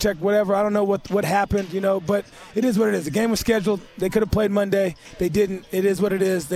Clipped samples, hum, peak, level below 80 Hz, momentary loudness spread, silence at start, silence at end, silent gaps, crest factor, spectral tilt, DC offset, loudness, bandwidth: under 0.1%; none; -6 dBFS; -44 dBFS; 5 LU; 0 s; 0 s; none; 14 dB; -5.5 dB/octave; under 0.1%; -22 LUFS; 15.5 kHz